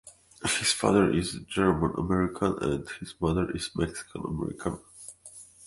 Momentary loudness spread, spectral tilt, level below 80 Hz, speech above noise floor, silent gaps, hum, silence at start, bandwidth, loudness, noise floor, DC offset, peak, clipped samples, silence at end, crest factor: 17 LU; -4.5 dB/octave; -46 dBFS; 23 dB; none; none; 0.05 s; 11.5 kHz; -28 LUFS; -50 dBFS; under 0.1%; -8 dBFS; under 0.1%; 0 s; 22 dB